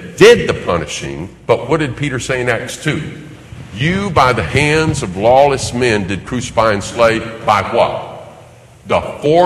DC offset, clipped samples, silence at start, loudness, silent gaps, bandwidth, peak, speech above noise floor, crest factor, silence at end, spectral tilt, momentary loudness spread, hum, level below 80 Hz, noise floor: under 0.1%; 0.3%; 0 s; -14 LUFS; none; 13 kHz; 0 dBFS; 26 dB; 14 dB; 0 s; -5 dB/octave; 15 LU; none; -36 dBFS; -40 dBFS